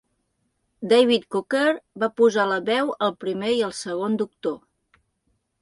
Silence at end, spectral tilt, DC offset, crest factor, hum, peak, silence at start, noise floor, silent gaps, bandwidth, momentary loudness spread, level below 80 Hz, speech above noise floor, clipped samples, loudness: 1.05 s; -4.5 dB/octave; under 0.1%; 18 dB; none; -6 dBFS; 0.8 s; -73 dBFS; none; 11.5 kHz; 9 LU; -68 dBFS; 51 dB; under 0.1%; -22 LUFS